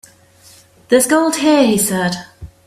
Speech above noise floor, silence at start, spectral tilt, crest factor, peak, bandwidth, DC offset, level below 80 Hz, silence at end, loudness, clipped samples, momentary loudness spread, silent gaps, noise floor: 33 dB; 0.9 s; -4 dB/octave; 16 dB; 0 dBFS; 16 kHz; under 0.1%; -48 dBFS; 0.2 s; -14 LUFS; under 0.1%; 8 LU; none; -46 dBFS